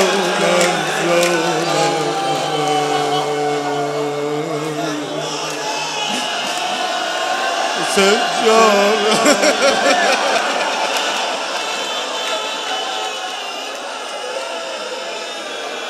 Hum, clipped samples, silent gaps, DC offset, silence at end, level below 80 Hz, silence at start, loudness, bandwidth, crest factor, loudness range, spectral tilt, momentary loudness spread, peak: none; under 0.1%; none; under 0.1%; 0 s; -66 dBFS; 0 s; -17 LUFS; 16 kHz; 18 dB; 8 LU; -2.5 dB/octave; 11 LU; 0 dBFS